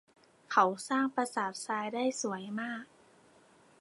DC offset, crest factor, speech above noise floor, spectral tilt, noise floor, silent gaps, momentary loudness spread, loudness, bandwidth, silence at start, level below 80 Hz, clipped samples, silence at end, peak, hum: under 0.1%; 22 dB; 30 dB; -3.5 dB/octave; -63 dBFS; none; 10 LU; -33 LUFS; 11.5 kHz; 0.5 s; -86 dBFS; under 0.1%; 0.95 s; -12 dBFS; none